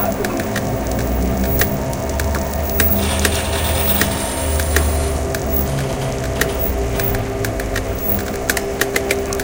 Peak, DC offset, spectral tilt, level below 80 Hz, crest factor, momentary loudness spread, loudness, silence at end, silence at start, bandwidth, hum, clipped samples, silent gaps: 0 dBFS; 0.2%; -4.5 dB/octave; -24 dBFS; 18 dB; 6 LU; -18 LUFS; 0 s; 0 s; 17.5 kHz; none; under 0.1%; none